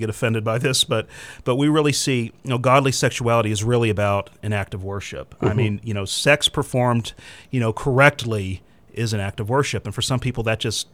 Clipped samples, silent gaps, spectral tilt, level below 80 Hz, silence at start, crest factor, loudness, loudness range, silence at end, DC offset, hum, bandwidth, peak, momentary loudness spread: under 0.1%; none; -4.5 dB/octave; -46 dBFS; 0 s; 20 dB; -21 LUFS; 2 LU; 0.1 s; 0.2%; none; 16 kHz; 0 dBFS; 12 LU